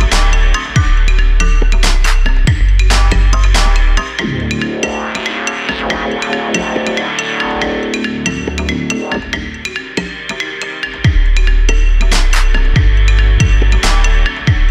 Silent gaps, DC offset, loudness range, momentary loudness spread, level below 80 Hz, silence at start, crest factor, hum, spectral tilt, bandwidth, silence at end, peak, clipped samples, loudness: none; under 0.1%; 5 LU; 8 LU; -12 dBFS; 0 s; 10 dB; none; -4.5 dB/octave; 11 kHz; 0 s; 0 dBFS; under 0.1%; -14 LUFS